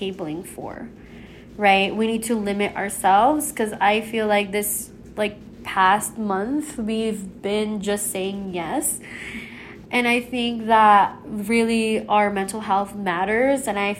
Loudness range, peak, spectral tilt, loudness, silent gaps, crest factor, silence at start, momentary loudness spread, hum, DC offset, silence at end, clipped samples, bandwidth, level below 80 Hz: 5 LU; -4 dBFS; -3.5 dB/octave; -21 LUFS; none; 18 dB; 0 s; 15 LU; none; under 0.1%; 0 s; under 0.1%; 16 kHz; -52 dBFS